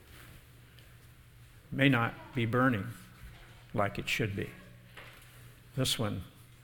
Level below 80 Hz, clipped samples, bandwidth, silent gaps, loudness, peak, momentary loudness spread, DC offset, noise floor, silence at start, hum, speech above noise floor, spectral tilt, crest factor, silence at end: -56 dBFS; under 0.1%; 19 kHz; none; -32 LUFS; -10 dBFS; 25 LU; under 0.1%; -56 dBFS; 0.1 s; none; 25 dB; -5 dB/octave; 26 dB; 0.2 s